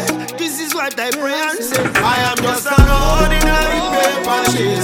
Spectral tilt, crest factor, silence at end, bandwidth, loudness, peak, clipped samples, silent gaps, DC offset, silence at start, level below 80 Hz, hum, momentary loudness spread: -4 dB/octave; 14 dB; 0 s; 17.5 kHz; -15 LUFS; 0 dBFS; under 0.1%; none; under 0.1%; 0 s; -20 dBFS; none; 6 LU